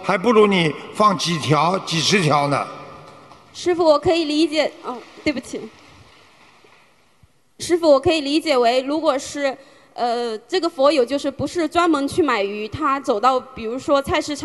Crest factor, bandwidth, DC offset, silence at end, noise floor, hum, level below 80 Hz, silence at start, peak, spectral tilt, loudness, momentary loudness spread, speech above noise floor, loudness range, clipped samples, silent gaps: 18 dB; 12.5 kHz; 0.1%; 0 s; -58 dBFS; none; -52 dBFS; 0 s; -2 dBFS; -4.5 dB/octave; -19 LUFS; 13 LU; 39 dB; 4 LU; under 0.1%; none